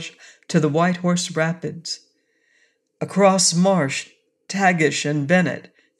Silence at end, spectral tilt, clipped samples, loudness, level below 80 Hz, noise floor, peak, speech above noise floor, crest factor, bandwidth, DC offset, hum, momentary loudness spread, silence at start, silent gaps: 0.4 s; -4.5 dB/octave; under 0.1%; -20 LUFS; -70 dBFS; -64 dBFS; -4 dBFS; 45 dB; 18 dB; 12.5 kHz; under 0.1%; none; 15 LU; 0 s; none